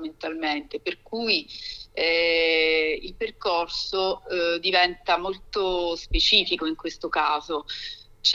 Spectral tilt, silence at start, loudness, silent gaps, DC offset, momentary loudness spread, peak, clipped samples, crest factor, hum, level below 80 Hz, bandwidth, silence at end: -3 dB/octave; 0 s; -24 LUFS; none; under 0.1%; 13 LU; -4 dBFS; under 0.1%; 22 dB; none; -42 dBFS; 7.8 kHz; 0 s